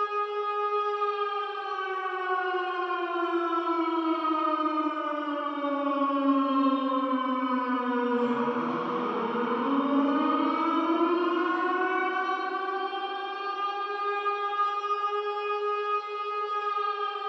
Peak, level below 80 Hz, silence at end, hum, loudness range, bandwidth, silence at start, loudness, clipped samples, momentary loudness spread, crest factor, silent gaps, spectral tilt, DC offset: -14 dBFS; -90 dBFS; 0 s; none; 3 LU; 6.4 kHz; 0 s; -28 LUFS; under 0.1%; 5 LU; 14 dB; none; -5.5 dB/octave; under 0.1%